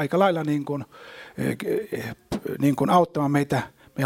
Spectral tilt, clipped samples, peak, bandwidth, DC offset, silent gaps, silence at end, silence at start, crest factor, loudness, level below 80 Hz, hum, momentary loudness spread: -7 dB/octave; under 0.1%; -6 dBFS; 16.5 kHz; under 0.1%; none; 0 s; 0 s; 18 dB; -24 LUFS; -56 dBFS; none; 14 LU